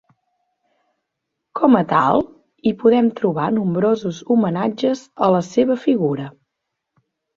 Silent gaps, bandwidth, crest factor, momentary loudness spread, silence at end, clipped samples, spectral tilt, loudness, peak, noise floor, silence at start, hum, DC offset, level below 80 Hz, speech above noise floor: none; 7.4 kHz; 18 dB; 8 LU; 1.05 s; under 0.1%; -7.5 dB/octave; -18 LUFS; -2 dBFS; -79 dBFS; 1.55 s; none; under 0.1%; -58 dBFS; 62 dB